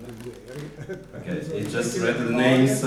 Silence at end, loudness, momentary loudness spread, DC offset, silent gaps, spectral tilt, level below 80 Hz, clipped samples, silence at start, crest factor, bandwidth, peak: 0 s; -23 LUFS; 19 LU; under 0.1%; none; -5.5 dB/octave; -54 dBFS; under 0.1%; 0 s; 18 dB; 15 kHz; -6 dBFS